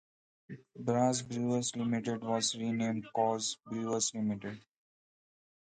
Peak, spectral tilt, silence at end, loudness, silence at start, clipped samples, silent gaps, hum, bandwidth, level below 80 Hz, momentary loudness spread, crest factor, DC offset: -16 dBFS; -4.5 dB/octave; 1.15 s; -33 LUFS; 0.5 s; under 0.1%; none; none; 9.4 kHz; -74 dBFS; 13 LU; 18 dB; under 0.1%